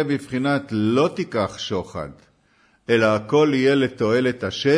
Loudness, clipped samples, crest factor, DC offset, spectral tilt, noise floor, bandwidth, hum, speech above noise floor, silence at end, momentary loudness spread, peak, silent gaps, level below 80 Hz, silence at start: -21 LUFS; under 0.1%; 14 dB; under 0.1%; -6 dB/octave; -60 dBFS; 11 kHz; none; 40 dB; 0 s; 10 LU; -6 dBFS; none; -56 dBFS; 0 s